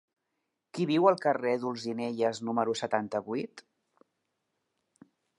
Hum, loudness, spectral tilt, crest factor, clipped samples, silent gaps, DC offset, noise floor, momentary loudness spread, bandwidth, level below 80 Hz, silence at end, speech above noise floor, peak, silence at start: none; -30 LUFS; -5.5 dB/octave; 24 dB; under 0.1%; none; under 0.1%; -83 dBFS; 11 LU; 11.5 kHz; -80 dBFS; 1.8 s; 53 dB; -8 dBFS; 0.75 s